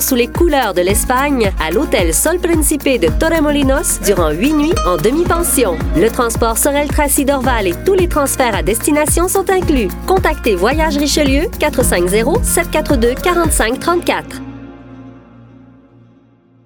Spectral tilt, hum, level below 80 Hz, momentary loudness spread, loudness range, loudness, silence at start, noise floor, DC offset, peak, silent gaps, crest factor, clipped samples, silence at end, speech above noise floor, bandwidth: -4 dB/octave; none; -24 dBFS; 3 LU; 2 LU; -13 LUFS; 0 s; -48 dBFS; under 0.1%; -2 dBFS; none; 12 dB; under 0.1%; 1.25 s; 35 dB; 19.5 kHz